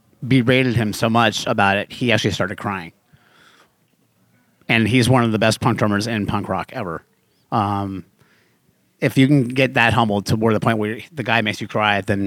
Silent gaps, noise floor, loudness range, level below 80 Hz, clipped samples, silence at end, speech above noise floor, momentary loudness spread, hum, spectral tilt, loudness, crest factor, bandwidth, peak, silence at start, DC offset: none; -62 dBFS; 5 LU; -54 dBFS; under 0.1%; 0 s; 44 dB; 11 LU; none; -5.5 dB/octave; -18 LUFS; 20 dB; 16 kHz; 0 dBFS; 0.2 s; under 0.1%